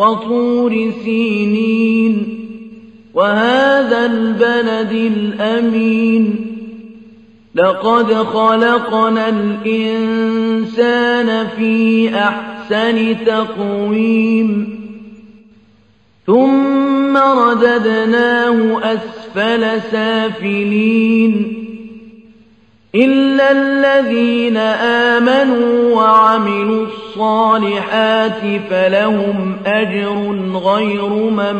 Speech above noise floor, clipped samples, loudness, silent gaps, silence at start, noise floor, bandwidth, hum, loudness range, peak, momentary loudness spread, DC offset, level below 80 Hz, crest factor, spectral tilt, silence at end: 39 dB; under 0.1%; -13 LUFS; none; 0 s; -52 dBFS; 8.4 kHz; none; 4 LU; 0 dBFS; 8 LU; 0.1%; -60 dBFS; 14 dB; -6.5 dB/octave; 0 s